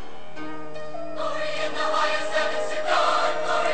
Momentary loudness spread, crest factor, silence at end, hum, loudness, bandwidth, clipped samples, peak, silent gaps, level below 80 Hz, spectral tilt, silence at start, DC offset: 15 LU; 16 dB; 0 s; none; -25 LUFS; 9 kHz; under 0.1%; -8 dBFS; none; -62 dBFS; -2.5 dB/octave; 0 s; 5%